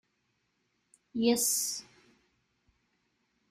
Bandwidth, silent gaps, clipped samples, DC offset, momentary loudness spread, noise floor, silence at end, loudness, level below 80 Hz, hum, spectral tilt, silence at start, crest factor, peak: 15.5 kHz; none; under 0.1%; under 0.1%; 14 LU; -78 dBFS; 1.7 s; -29 LUFS; -76 dBFS; none; -2 dB/octave; 1.15 s; 22 dB; -14 dBFS